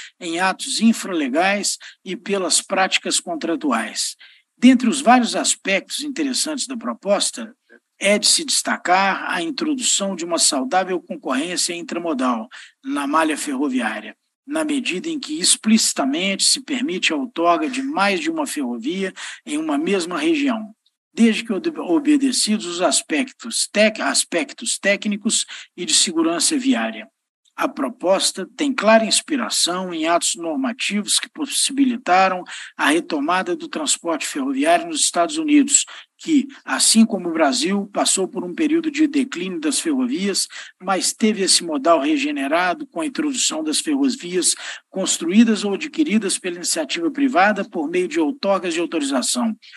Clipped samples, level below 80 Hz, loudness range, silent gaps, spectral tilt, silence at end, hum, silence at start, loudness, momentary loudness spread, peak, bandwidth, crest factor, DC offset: under 0.1%; -78 dBFS; 3 LU; 14.35-14.43 s, 20.97-21.11 s, 27.29-27.43 s; -2.5 dB/octave; 0 s; none; 0 s; -19 LUFS; 10 LU; 0 dBFS; 13 kHz; 20 dB; under 0.1%